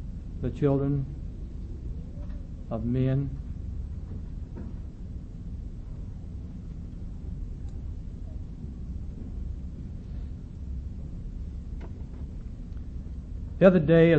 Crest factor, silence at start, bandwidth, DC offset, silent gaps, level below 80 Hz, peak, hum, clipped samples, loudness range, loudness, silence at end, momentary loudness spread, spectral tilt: 24 dB; 0 s; 7.4 kHz; under 0.1%; none; -38 dBFS; -6 dBFS; none; under 0.1%; 9 LU; -32 LUFS; 0 s; 14 LU; -9.5 dB/octave